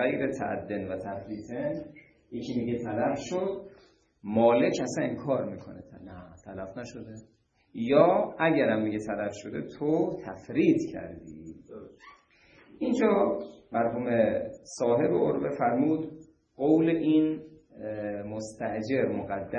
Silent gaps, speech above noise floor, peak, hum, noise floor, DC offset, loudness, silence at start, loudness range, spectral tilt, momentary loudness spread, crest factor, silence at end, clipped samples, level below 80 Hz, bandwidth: none; 31 dB; -8 dBFS; none; -59 dBFS; under 0.1%; -28 LUFS; 0 s; 6 LU; -6.5 dB/octave; 20 LU; 22 dB; 0 s; under 0.1%; -64 dBFS; 9 kHz